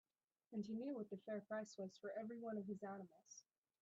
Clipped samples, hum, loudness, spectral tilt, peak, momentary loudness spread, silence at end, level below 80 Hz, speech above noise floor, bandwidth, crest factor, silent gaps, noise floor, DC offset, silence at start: under 0.1%; none; -51 LUFS; -6.5 dB/octave; -36 dBFS; 12 LU; 0.4 s; under -90 dBFS; 21 dB; 8 kHz; 14 dB; none; -71 dBFS; under 0.1%; 0.5 s